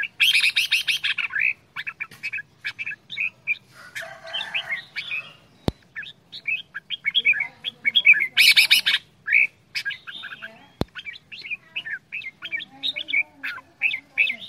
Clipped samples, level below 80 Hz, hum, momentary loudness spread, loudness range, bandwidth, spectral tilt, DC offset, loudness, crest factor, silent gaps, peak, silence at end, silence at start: under 0.1%; -54 dBFS; none; 20 LU; 13 LU; 16 kHz; -0.5 dB/octave; under 0.1%; -21 LUFS; 24 dB; none; -2 dBFS; 0 s; 0 s